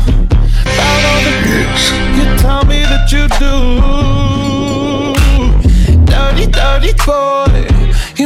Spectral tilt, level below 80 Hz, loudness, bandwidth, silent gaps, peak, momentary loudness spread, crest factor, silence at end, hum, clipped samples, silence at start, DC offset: -5 dB/octave; -10 dBFS; -11 LUFS; 14.5 kHz; none; -2 dBFS; 4 LU; 6 dB; 0 s; none; under 0.1%; 0 s; under 0.1%